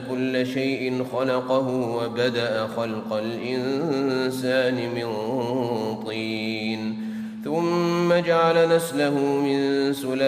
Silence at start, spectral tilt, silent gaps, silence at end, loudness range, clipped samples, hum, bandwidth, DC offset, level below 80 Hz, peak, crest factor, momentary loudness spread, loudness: 0 s; -5.5 dB/octave; none; 0 s; 4 LU; under 0.1%; none; 15.5 kHz; under 0.1%; -68 dBFS; -8 dBFS; 14 dB; 8 LU; -24 LUFS